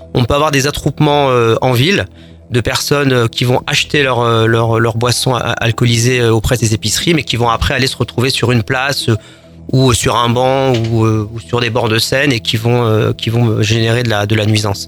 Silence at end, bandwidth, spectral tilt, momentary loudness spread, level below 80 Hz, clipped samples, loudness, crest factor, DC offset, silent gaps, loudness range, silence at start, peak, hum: 0 s; 19 kHz; -5 dB/octave; 4 LU; -34 dBFS; under 0.1%; -13 LUFS; 12 dB; under 0.1%; none; 1 LU; 0 s; 0 dBFS; none